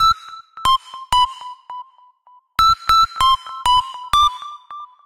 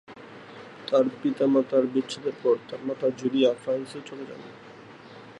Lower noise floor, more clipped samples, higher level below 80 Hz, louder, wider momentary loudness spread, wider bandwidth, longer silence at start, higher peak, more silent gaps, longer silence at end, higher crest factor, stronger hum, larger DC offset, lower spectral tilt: first, -52 dBFS vs -46 dBFS; neither; first, -40 dBFS vs -76 dBFS; first, -17 LUFS vs -26 LUFS; about the same, 21 LU vs 22 LU; first, 16 kHz vs 11 kHz; about the same, 0 s vs 0.1 s; first, -4 dBFS vs -10 dBFS; neither; first, 0.2 s vs 0.05 s; about the same, 14 dB vs 18 dB; neither; neither; second, -0.5 dB/octave vs -6 dB/octave